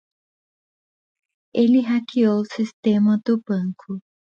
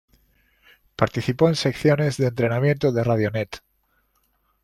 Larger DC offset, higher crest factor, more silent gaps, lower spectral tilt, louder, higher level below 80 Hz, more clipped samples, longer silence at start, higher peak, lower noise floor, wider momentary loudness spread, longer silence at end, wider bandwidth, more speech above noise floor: neither; about the same, 16 dB vs 20 dB; first, 2.73-2.83 s vs none; first, -8 dB/octave vs -6.5 dB/octave; about the same, -20 LUFS vs -22 LUFS; second, -68 dBFS vs -54 dBFS; neither; first, 1.55 s vs 1 s; second, -6 dBFS vs -2 dBFS; first, under -90 dBFS vs -67 dBFS; about the same, 11 LU vs 10 LU; second, 0.25 s vs 1.05 s; second, 7.2 kHz vs 13.5 kHz; first, over 70 dB vs 46 dB